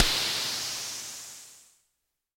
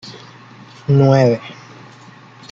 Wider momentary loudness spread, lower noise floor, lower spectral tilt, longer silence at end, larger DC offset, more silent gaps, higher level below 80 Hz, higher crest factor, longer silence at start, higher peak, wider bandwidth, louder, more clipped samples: second, 19 LU vs 26 LU; first, -80 dBFS vs -41 dBFS; second, 0 dB/octave vs -8 dB/octave; second, 0.75 s vs 1 s; neither; neither; first, -46 dBFS vs -54 dBFS; first, 26 dB vs 16 dB; about the same, 0 s vs 0.05 s; second, -6 dBFS vs -2 dBFS; first, 16.5 kHz vs 7.2 kHz; second, -29 LUFS vs -14 LUFS; neither